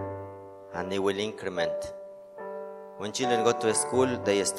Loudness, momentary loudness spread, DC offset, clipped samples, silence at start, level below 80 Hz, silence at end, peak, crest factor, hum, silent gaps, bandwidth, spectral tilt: -28 LUFS; 18 LU; under 0.1%; under 0.1%; 0 s; -66 dBFS; 0 s; -10 dBFS; 20 dB; none; none; 13 kHz; -3.5 dB/octave